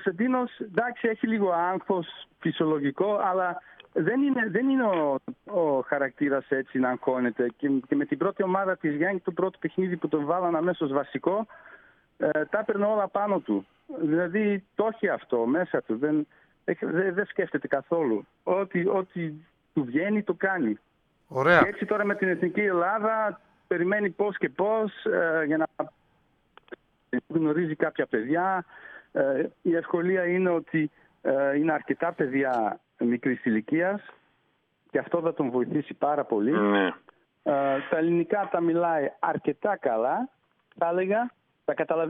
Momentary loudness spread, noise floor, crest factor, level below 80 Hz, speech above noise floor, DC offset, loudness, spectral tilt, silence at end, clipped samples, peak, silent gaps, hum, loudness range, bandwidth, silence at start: 7 LU; -71 dBFS; 22 dB; -72 dBFS; 45 dB; under 0.1%; -27 LUFS; -9 dB/octave; 0 s; under 0.1%; -6 dBFS; none; none; 3 LU; 5 kHz; 0 s